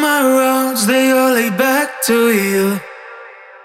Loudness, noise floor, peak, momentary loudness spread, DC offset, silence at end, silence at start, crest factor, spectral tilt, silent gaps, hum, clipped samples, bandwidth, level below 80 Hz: -14 LUFS; -37 dBFS; -2 dBFS; 12 LU; under 0.1%; 0.2 s; 0 s; 12 dB; -3.5 dB/octave; none; none; under 0.1%; 17 kHz; -66 dBFS